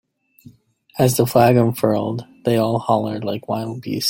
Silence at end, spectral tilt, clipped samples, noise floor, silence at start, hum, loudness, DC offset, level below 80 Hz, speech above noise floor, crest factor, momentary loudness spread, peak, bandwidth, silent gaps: 0 s; -6 dB/octave; under 0.1%; -49 dBFS; 0.95 s; none; -19 LUFS; under 0.1%; -56 dBFS; 32 dB; 18 dB; 12 LU; -2 dBFS; 16.5 kHz; none